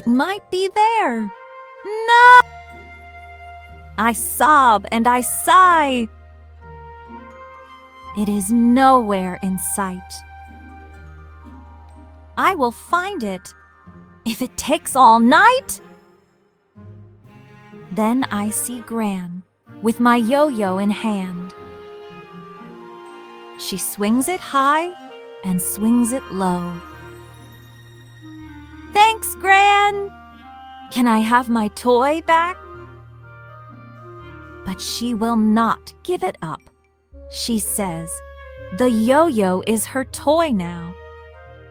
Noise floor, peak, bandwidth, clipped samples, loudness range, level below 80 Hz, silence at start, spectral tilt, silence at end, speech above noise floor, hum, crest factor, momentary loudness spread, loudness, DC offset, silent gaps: -60 dBFS; 0 dBFS; over 20 kHz; under 0.1%; 9 LU; -50 dBFS; 0.05 s; -4 dB/octave; 0.45 s; 43 dB; none; 18 dB; 26 LU; -17 LUFS; under 0.1%; none